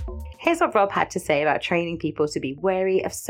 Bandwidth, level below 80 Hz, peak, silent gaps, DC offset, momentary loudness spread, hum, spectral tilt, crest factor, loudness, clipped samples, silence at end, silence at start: 16.5 kHz; -44 dBFS; -4 dBFS; none; under 0.1%; 6 LU; none; -5 dB/octave; 20 dB; -23 LUFS; under 0.1%; 0 s; 0 s